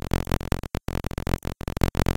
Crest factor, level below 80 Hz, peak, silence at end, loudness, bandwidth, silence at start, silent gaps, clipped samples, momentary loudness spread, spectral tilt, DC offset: 24 dB; -30 dBFS; -2 dBFS; 0.05 s; -29 LUFS; 17 kHz; 0.15 s; none; under 0.1%; 5 LU; -6 dB/octave; under 0.1%